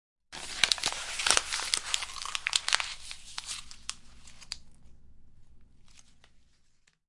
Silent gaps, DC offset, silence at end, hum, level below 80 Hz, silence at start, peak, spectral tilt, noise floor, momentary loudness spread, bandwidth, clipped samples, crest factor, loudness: none; under 0.1%; 0.7 s; none; -56 dBFS; 0.3 s; -2 dBFS; 1.5 dB/octave; -65 dBFS; 17 LU; 11.5 kHz; under 0.1%; 34 dB; -30 LUFS